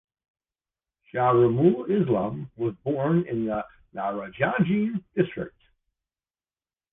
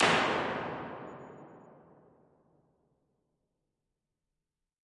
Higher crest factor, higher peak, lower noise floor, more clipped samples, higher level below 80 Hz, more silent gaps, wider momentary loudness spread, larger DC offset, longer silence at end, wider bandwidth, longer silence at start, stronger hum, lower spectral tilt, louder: second, 18 dB vs 26 dB; about the same, -8 dBFS vs -10 dBFS; about the same, under -90 dBFS vs -89 dBFS; neither; first, -58 dBFS vs -70 dBFS; neither; second, 12 LU vs 24 LU; neither; second, 1.45 s vs 3.1 s; second, 3.8 kHz vs 11.5 kHz; first, 1.15 s vs 0 s; neither; first, -11 dB/octave vs -3.5 dB/octave; first, -25 LUFS vs -32 LUFS